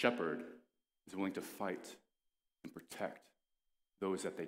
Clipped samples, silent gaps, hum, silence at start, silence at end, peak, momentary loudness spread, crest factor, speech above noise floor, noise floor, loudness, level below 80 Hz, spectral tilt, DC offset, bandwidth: under 0.1%; none; none; 0 s; 0 s; -16 dBFS; 17 LU; 28 dB; 47 dB; -88 dBFS; -43 LUFS; -86 dBFS; -4.5 dB/octave; under 0.1%; 16 kHz